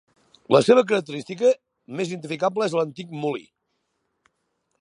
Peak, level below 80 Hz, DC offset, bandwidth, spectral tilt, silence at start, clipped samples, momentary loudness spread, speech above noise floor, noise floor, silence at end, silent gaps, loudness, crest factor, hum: -2 dBFS; -74 dBFS; under 0.1%; 11 kHz; -5.5 dB/octave; 0.5 s; under 0.1%; 13 LU; 53 dB; -75 dBFS; 1.4 s; none; -22 LUFS; 22 dB; none